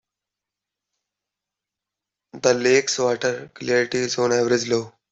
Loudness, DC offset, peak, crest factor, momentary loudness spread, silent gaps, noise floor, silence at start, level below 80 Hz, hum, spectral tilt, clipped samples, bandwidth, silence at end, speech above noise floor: -21 LUFS; under 0.1%; -2 dBFS; 20 dB; 7 LU; none; -87 dBFS; 2.35 s; -66 dBFS; 50 Hz at -65 dBFS; -3.5 dB/octave; under 0.1%; 8.2 kHz; 0.25 s; 66 dB